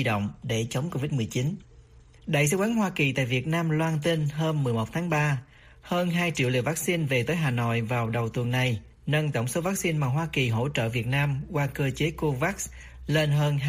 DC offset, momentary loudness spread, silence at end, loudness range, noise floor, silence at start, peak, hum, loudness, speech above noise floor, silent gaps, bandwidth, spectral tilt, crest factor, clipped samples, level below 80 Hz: under 0.1%; 5 LU; 0 s; 1 LU; -52 dBFS; 0 s; -10 dBFS; none; -27 LUFS; 26 dB; none; 15.5 kHz; -5.5 dB/octave; 16 dB; under 0.1%; -52 dBFS